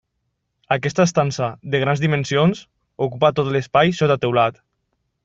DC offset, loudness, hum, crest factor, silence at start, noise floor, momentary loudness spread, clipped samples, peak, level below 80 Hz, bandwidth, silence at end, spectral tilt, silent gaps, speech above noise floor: under 0.1%; -19 LUFS; none; 18 dB; 0.7 s; -74 dBFS; 7 LU; under 0.1%; -2 dBFS; -56 dBFS; 7.8 kHz; 0.75 s; -6 dB/octave; none; 55 dB